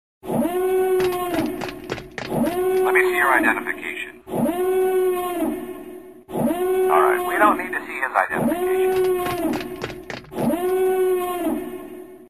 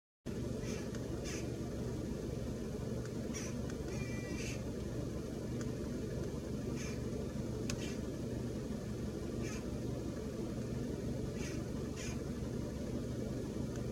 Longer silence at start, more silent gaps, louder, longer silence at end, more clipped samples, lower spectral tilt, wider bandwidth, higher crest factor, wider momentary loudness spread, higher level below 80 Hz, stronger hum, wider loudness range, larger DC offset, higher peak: about the same, 0.25 s vs 0.25 s; neither; first, -21 LUFS vs -41 LUFS; about the same, 0.05 s vs 0 s; neither; about the same, -5 dB/octave vs -6 dB/octave; about the same, 15 kHz vs 16.5 kHz; about the same, 18 dB vs 20 dB; first, 14 LU vs 1 LU; about the same, -52 dBFS vs -50 dBFS; neither; first, 3 LU vs 0 LU; first, 0.3% vs under 0.1%; first, -4 dBFS vs -20 dBFS